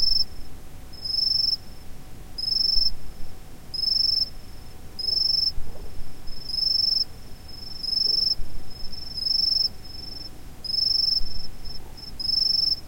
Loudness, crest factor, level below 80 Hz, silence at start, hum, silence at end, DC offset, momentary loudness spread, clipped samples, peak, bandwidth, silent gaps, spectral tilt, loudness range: -22 LUFS; 16 dB; -38 dBFS; 0 s; none; 0 s; under 0.1%; 21 LU; under 0.1%; -8 dBFS; 16.5 kHz; none; -2.5 dB/octave; 1 LU